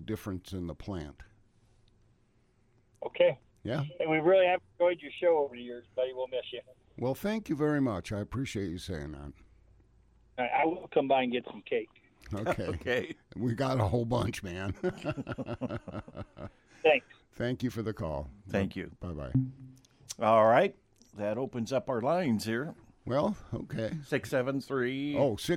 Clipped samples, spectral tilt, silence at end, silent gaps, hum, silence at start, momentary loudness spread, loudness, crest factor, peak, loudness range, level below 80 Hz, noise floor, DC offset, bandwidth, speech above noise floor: under 0.1%; -6.5 dB/octave; 0 s; none; none; 0 s; 16 LU; -32 LUFS; 20 dB; -12 dBFS; 5 LU; -56 dBFS; -68 dBFS; under 0.1%; 16 kHz; 37 dB